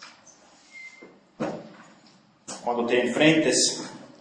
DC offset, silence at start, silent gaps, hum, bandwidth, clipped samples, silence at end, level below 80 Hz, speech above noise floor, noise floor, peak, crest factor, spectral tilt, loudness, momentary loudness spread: under 0.1%; 0 s; none; none; 10.5 kHz; under 0.1%; 0.15 s; -74 dBFS; 35 dB; -57 dBFS; -6 dBFS; 20 dB; -3 dB/octave; -23 LUFS; 24 LU